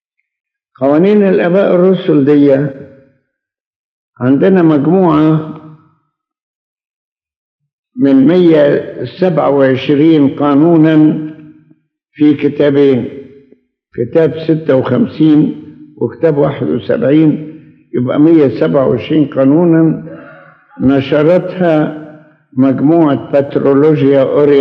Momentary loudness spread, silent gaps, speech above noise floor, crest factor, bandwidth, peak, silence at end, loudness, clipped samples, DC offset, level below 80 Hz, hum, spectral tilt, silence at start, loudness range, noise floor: 12 LU; 3.60-4.13 s, 6.43-6.77 s, 6.96-7.16 s, 7.36-7.59 s, 7.73-7.83 s; 60 dB; 10 dB; 5.4 kHz; 0 dBFS; 0 s; -10 LUFS; under 0.1%; under 0.1%; -54 dBFS; none; -10 dB/octave; 0.8 s; 3 LU; -69 dBFS